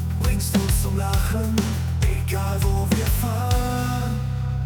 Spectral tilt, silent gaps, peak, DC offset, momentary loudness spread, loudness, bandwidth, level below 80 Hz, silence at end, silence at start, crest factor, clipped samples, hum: -5.5 dB/octave; none; -8 dBFS; under 0.1%; 3 LU; -23 LUFS; 19.5 kHz; -28 dBFS; 0 s; 0 s; 14 dB; under 0.1%; none